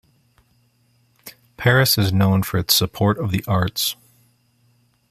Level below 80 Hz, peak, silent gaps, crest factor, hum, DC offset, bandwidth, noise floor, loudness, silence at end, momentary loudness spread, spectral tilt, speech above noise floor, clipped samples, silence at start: -50 dBFS; -2 dBFS; none; 20 dB; none; under 0.1%; 15 kHz; -61 dBFS; -18 LUFS; 1.2 s; 7 LU; -4.5 dB/octave; 43 dB; under 0.1%; 1.25 s